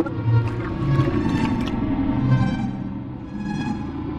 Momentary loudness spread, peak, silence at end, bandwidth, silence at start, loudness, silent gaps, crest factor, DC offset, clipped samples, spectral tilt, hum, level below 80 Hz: 10 LU; -8 dBFS; 0 s; 8.4 kHz; 0 s; -23 LUFS; none; 14 dB; under 0.1%; under 0.1%; -8.5 dB/octave; none; -36 dBFS